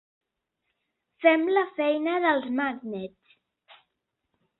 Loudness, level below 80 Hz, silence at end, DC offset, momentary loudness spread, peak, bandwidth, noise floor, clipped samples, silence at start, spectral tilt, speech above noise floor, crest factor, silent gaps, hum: -25 LUFS; -74 dBFS; 1.5 s; under 0.1%; 14 LU; -6 dBFS; 4.2 kHz; -81 dBFS; under 0.1%; 1.2 s; -8.5 dB/octave; 56 dB; 22 dB; none; none